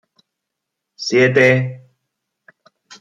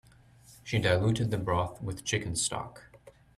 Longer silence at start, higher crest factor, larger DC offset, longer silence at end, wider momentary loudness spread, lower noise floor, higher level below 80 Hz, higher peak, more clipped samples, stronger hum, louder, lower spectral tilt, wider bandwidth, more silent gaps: first, 1 s vs 0.5 s; about the same, 18 dB vs 18 dB; neither; first, 1.2 s vs 0.3 s; first, 15 LU vs 12 LU; first, -79 dBFS vs -57 dBFS; second, -62 dBFS vs -54 dBFS; first, -2 dBFS vs -12 dBFS; neither; neither; first, -15 LUFS vs -30 LUFS; about the same, -5.5 dB/octave vs -4.5 dB/octave; second, 7.8 kHz vs 13.5 kHz; neither